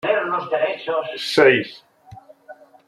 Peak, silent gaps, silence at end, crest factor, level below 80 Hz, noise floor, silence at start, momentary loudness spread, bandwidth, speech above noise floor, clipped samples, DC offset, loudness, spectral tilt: -2 dBFS; none; 0.35 s; 20 dB; -66 dBFS; -45 dBFS; 0.05 s; 10 LU; 13 kHz; 26 dB; under 0.1%; under 0.1%; -19 LUFS; -4.5 dB/octave